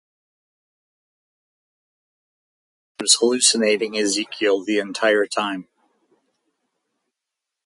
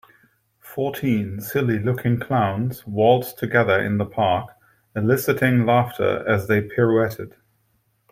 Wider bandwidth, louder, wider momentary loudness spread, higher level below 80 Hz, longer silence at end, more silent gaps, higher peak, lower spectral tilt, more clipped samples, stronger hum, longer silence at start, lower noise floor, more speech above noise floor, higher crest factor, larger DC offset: second, 11.5 kHz vs 16 kHz; about the same, -19 LUFS vs -21 LUFS; about the same, 9 LU vs 9 LU; second, -74 dBFS vs -58 dBFS; first, 2.05 s vs 0.85 s; neither; about the same, 0 dBFS vs -2 dBFS; second, -1 dB/octave vs -7 dB/octave; neither; neither; first, 3 s vs 0.65 s; first, -84 dBFS vs -66 dBFS; first, 64 dB vs 46 dB; first, 24 dB vs 18 dB; neither